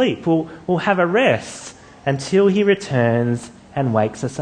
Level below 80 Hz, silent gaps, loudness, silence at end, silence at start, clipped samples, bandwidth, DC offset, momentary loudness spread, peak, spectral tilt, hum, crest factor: -56 dBFS; none; -19 LUFS; 0 s; 0 s; under 0.1%; 9.8 kHz; under 0.1%; 12 LU; -2 dBFS; -6 dB/octave; none; 18 dB